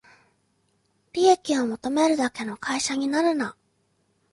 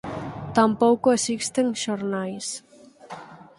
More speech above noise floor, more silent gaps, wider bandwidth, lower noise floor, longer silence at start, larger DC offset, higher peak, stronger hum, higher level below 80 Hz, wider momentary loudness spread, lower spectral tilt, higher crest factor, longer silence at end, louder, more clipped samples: first, 45 dB vs 21 dB; neither; about the same, 11.5 kHz vs 11.5 kHz; first, -69 dBFS vs -43 dBFS; first, 1.15 s vs 0.05 s; neither; about the same, -6 dBFS vs -4 dBFS; neither; second, -66 dBFS vs -58 dBFS; second, 10 LU vs 22 LU; about the same, -3 dB/octave vs -4 dB/octave; about the same, 18 dB vs 20 dB; first, 0.8 s vs 0.15 s; about the same, -24 LUFS vs -23 LUFS; neither